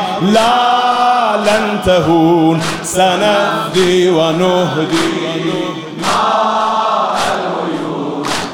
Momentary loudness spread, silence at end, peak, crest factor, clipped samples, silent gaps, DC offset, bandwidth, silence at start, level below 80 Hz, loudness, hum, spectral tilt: 7 LU; 0 s; 0 dBFS; 12 dB; under 0.1%; none; 0.6%; 17 kHz; 0 s; -44 dBFS; -13 LUFS; none; -4.5 dB/octave